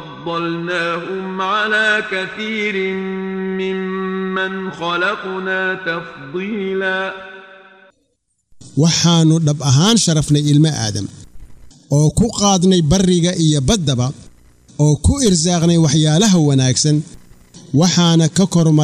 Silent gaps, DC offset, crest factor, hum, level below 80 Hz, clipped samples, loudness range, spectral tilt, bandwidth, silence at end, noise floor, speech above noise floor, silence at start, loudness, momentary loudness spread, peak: none; under 0.1%; 12 dB; none; -38 dBFS; under 0.1%; 7 LU; -4.5 dB/octave; 13.5 kHz; 0 s; -67 dBFS; 52 dB; 0 s; -16 LUFS; 11 LU; -2 dBFS